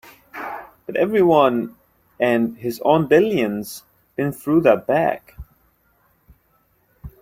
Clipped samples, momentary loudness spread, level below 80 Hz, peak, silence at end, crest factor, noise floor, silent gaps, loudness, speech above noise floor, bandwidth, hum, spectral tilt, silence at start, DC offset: under 0.1%; 18 LU; -52 dBFS; -2 dBFS; 0.15 s; 18 dB; -62 dBFS; none; -19 LUFS; 44 dB; 16.5 kHz; none; -6.5 dB/octave; 0.35 s; under 0.1%